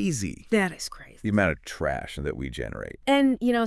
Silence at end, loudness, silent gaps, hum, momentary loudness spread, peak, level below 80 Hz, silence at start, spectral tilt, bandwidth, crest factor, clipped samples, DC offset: 0 s; -27 LUFS; none; none; 12 LU; -8 dBFS; -46 dBFS; 0 s; -5 dB/octave; 12 kHz; 18 dB; under 0.1%; under 0.1%